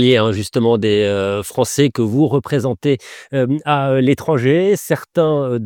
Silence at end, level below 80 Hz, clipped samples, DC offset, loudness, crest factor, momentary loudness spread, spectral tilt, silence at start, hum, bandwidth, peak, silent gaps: 0 s; -54 dBFS; under 0.1%; under 0.1%; -16 LUFS; 16 dB; 5 LU; -6 dB/octave; 0 s; none; 18.5 kHz; 0 dBFS; none